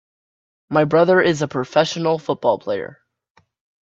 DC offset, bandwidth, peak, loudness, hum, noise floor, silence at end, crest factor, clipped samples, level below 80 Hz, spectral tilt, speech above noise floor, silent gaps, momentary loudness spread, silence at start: under 0.1%; 7.8 kHz; -2 dBFS; -18 LUFS; none; -61 dBFS; 0.95 s; 18 dB; under 0.1%; -62 dBFS; -5.5 dB/octave; 43 dB; none; 10 LU; 0.7 s